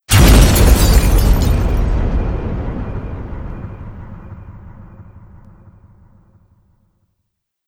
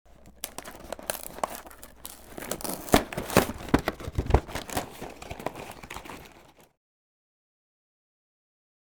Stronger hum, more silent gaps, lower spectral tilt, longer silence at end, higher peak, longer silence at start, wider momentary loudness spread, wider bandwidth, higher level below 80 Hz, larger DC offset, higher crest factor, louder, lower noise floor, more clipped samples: neither; neither; about the same, -5 dB/octave vs -4.5 dB/octave; first, 2.65 s vs 2.35 s; about the same, 0 dBFS vs -2 dBFS; second, 0.1 s vs 0.25 s; first, 25 LU vs 18 LU; second, 17.5 kHz vs over 20 kHz; first, -16 dBFS vs -40 dBFS; second, under 0.1% vs 0.1%; second, 14 dB vs 30 dB; first, -14 LUFS vs -30 LUFS; first, -72 dBFS vs -55 dBFS; neither